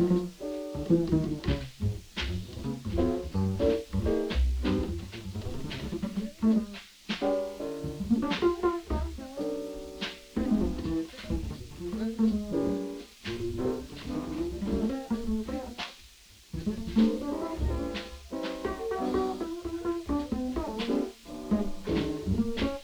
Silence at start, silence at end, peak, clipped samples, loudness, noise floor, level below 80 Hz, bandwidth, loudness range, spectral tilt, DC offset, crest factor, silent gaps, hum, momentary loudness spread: 0 s; 0 s; -14 dBFS; under 0.1%; -32 LUFS; -54 dBFS; -40 dBFS; over 20 kHz; 3 LU; -7 dB/octave; under 0.1%; 18 dB; none; none; 10 LU